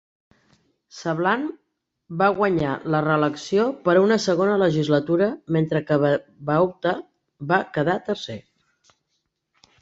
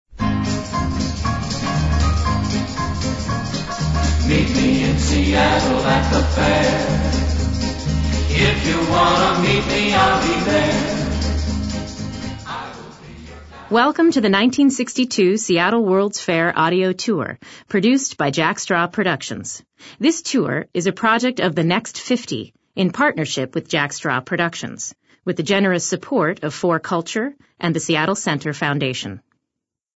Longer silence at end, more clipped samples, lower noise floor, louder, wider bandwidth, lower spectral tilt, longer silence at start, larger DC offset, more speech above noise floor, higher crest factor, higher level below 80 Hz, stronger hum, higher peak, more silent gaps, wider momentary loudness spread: first, 1.4 s vs 0.8 s; neither; second, -75 dBFS vs -82 dBFS; second, -22 LUFS vs -19 LUFS; about the same, 8 kHz vs 8 kHz; first, -6.5 dB/octave vs -5 dB/octave; first, 0.95 s vs 0.1 s; neither; second, 54 dB vs 64 dB; about the same, 18 dB vs 18 dB; second, -60 dBFS vs -28 dBFS; neither; about the same, -4 dBFS vs -2 dBFS; neither; second, 10 LU vs 13 LU